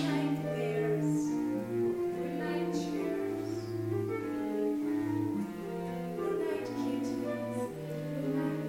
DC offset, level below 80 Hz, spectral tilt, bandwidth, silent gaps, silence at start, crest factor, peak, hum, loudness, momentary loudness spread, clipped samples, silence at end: under 0.1%; -66 dBFS; -7 dB/octave; 16.5 kHz; none; 0 s; 14 dB; -20 dBFS; none; -34 LUFS; 6 LU; under 0.1%; 0 s